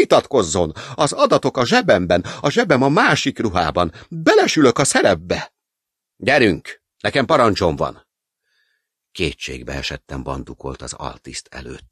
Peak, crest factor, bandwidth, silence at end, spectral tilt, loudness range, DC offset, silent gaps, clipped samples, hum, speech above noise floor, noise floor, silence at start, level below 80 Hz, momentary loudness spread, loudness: 0 dBFS; 18 dB; 14 kHz; 0.15 s; -4.5 dB/octave; 12 LU; under 0.1%; none; under 0.1%; none; 65 dB; -83 dBFS; 0 s; -42 dBFS; 16 LU; -17 LUFS